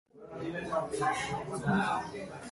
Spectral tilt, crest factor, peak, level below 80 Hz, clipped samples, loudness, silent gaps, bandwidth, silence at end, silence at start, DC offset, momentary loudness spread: -5.5 dB/octave; 16 dB; -18 dBFS; -60 dBFS; under 0.1%; -34 LUFS; none; 11.5 kHz; 0 s; 0.15 s; under 0.1%; 11 LU